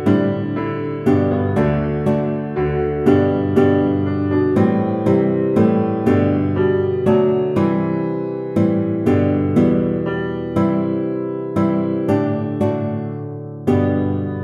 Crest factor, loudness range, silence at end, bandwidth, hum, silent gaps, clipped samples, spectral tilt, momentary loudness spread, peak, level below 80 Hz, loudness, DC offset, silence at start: 16 dB; 3 LU; 0 s; 9.6 kHz; none; none; under 0.1%; -9.5 dB/octave; 7 LU; -2 dBFS; -42 dBFS; -18 LUFS; under 0.1%; 0 s